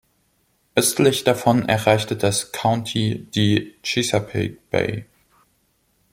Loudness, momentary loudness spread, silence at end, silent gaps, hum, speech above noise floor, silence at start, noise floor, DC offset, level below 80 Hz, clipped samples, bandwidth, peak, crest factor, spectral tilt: -20 LUFS; 7 LU; 1.1 s; none; none; 45 dB; 0.75 s; -65 dBFS; under 0.1%; -56 dBFS; under 0.1%; 16.5 kHz; 0 dBFS; 22 dB; -4.5 dB/octave